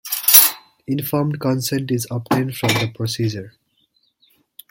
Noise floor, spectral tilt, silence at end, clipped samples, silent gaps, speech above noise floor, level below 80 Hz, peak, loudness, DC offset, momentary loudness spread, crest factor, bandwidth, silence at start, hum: -64 dBFS; -3.5 dB/octave; 1.2 s; under 0.1%; none; 43 dB; -58 dBFS; 0 dBFS; -17 LUFS; under 0.1%; 15 LU; 20 dB; 17 kHz; 0.05 s; none